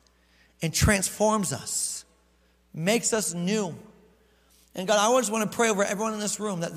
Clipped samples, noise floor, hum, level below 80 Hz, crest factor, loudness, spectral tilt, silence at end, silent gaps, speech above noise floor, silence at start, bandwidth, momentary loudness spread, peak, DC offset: under 0.1%; -64 dBFS; none; -46 dBFS; 18 dB; -25 LUFS; -3.5 dB/octave; 0 s; none; 38 dB; 0.6 s; 16 kHz; 13 LU; -8 dBFS; under 0.1%